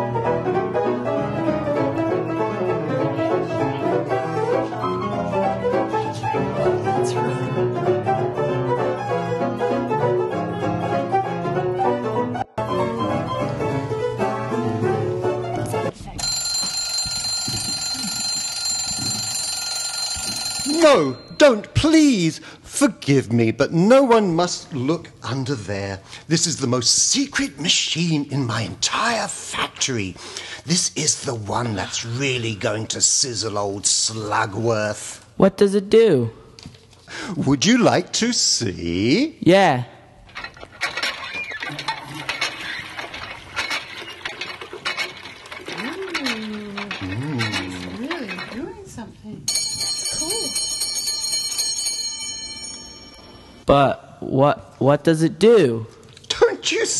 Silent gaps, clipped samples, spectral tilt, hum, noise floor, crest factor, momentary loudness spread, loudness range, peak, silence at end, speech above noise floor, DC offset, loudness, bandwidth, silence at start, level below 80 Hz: none; under 0.1%; -3.5 dB/octave; none; -43 dBFS; 20 dB; 13 LU; 9 LU; 0 dBFS; 0 s; 24 dB; under 0.1%; -21 LUFS; 13 kHz; 0 s; -48 dBFS